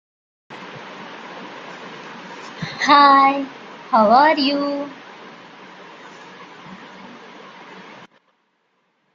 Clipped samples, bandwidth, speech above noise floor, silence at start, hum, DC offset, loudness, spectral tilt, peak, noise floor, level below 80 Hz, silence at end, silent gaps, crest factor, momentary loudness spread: under 0.1%; 7.4 kHz; 52 dB; 0.5 s; none; under 0.1%; -15 LUFS; -4.5 dB/octave; -2 dBFS; -67 dBFS; -70 dBFS; 2.3 s; none; 20 dB; 27 LU